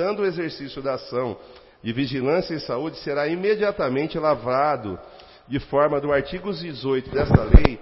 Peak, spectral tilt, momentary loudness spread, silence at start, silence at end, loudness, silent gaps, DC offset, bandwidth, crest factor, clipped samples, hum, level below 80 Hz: 0 dBFS; -10.5 dB/octave; 10 LU; 0 s; 0 s; -23 LUFS; none; under 0.1%; 5.8 kHz; 22 dB; under 0.1%; none; -28 dBFS